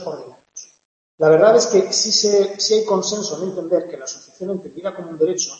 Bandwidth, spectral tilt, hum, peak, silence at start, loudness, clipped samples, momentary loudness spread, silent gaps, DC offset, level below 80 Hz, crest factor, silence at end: 8.6 kHz; -3 dB/octave; none; -2 dBFS; 0 s; -17 LUFS; under 0.1%; 20 LU; 0.85-1.18 s; under 0.1%; -68 dBFS; 18 dB; 0 s